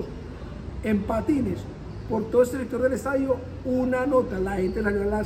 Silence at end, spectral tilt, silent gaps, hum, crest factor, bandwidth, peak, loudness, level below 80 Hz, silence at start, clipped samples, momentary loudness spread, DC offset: 0 s; -7.5 dB/octave; none; none; 16 dB; 15.5 kHz; -10 dBFS; -25 LUFS; -40 dBFS; 0 s; under 0.1%; 15 LU; under 0.1%